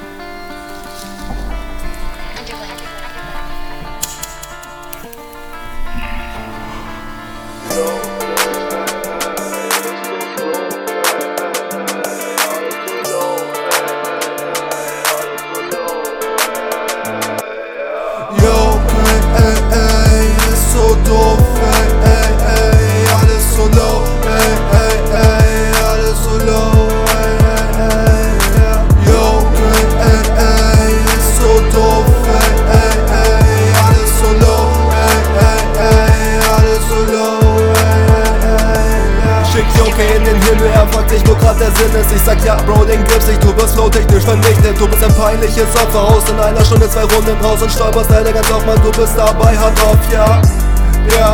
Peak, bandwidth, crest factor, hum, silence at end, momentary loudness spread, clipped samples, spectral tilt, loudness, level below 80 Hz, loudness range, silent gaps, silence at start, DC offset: 0 dBFS; 19 kHz; 10 dB; none; 0 s; 17 LU; 0.6%; -5 dB/octave; -12 LUFS; -14 dBFS; 15 LU; none; 0 s; under 0.1%